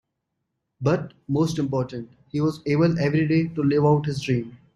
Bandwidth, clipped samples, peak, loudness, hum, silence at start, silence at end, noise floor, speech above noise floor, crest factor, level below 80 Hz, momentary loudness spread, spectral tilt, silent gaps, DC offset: 11.5 kHz; under 0.1%; -6 dBFS; -23 LUFS; none; 0.8 s; 0.2 s; -79 dBFS; 57 dB; 18 dB; -56 dBFS; 7 LU; -7.5 dB/octave; none; under 0.1%